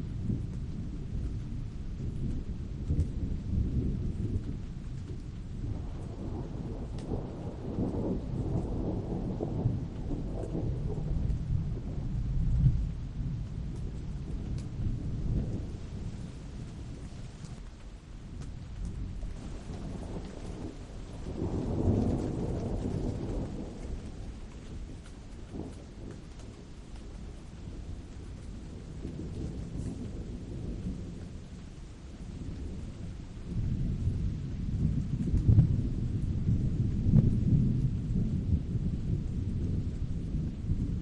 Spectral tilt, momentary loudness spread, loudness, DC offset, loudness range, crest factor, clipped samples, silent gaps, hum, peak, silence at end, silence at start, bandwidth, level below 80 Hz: -9 dB/octave; 15 LU; -35 LUFS; under 0.1%; 14 LU; 20 dB; under 0.1%; none; none; -12 dBFS; 0 s; 0 s; 10 kHz; -38 dBFS